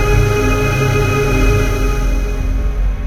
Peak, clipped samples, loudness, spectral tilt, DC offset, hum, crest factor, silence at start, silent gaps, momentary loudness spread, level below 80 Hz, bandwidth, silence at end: 0 dBFS; under 0.1%; -16 LUFS; -6 dB/octave; under 0.1%; none; 12 dB; 0 s; none; 6 LU; -16 dBFS; 15.5 kHz; 0 s